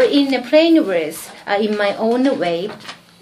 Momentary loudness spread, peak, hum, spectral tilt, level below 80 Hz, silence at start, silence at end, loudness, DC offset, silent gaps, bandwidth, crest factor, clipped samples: 16 LU; 0 dBFS; none; -4.5 dB/octave; -66 dBFS; 0 s; 0.3 s; -17 LUFS; under 0.1%; none; 15.5 kHz; 16 dB; under 0.1%